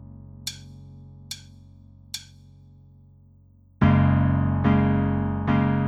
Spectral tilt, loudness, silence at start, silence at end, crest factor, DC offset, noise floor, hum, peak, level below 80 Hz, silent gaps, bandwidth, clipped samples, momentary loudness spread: -7 dB/octave; -22 LUFS; 0 s; 0 s; 18 dB; under 0.1%; -54 dBFS; none; -6 dBFS; -42 dBFS; none; 14 kHz; under 0.1%; 24 LU